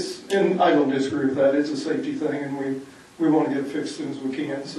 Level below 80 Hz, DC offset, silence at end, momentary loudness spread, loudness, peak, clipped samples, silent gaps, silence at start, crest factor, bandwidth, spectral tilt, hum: -70 dBFS; under 0.1%; 0 s; 10 LU; -23 LUFS; -8 dBFS; under 0.1%; none; 0 s; 16 dB; 11.5 kHz; -6 dB/octave; none